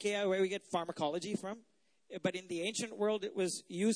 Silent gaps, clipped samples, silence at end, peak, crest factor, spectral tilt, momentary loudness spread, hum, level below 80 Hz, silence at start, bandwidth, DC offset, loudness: none; under 0.1%; 0 s; -20 dBFS; 16 dB; -4 dB/octave; 8 LU; none; -82 dBFS; 0 s; 11 kHz; under 0.1%; -37 LUFS